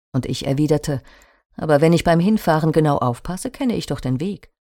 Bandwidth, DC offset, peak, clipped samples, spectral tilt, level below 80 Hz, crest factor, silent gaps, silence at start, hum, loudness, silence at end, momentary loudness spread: 17 kHz; under 0.1%; -2 dBFS; under 0.1%; -6.5 dB/octave; -42 dBFS; 16 dB; 1.46-1.50 s; 0.15 s; none; -19 LUFS; 0.35 s; 13 LU